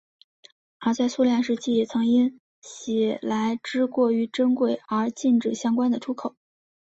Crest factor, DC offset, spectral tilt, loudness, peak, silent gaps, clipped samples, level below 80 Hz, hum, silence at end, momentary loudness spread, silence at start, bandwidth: 14 dB; under 0.1%; -5 dB/octave; -24 LUFS; -10 dBFS; 2.40-2.62 s; under 0.1%; -68 dBFS; none; 0.65 s; 7 LU; 0.8 s; 8 kHz